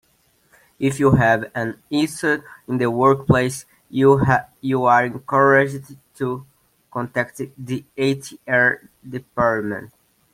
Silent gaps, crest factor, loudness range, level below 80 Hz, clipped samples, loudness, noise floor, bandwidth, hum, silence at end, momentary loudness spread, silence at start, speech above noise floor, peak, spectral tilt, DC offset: none; 18 dB; 6 LU; -48 dBFS; under 0.1%; -19 LUFS; -61 dBFS; 16 kHz; none; 0.5 s; 15 LU; 0.8 s; 42 dB; -2 dBFS; -6.5 dB/octave; under 0.1%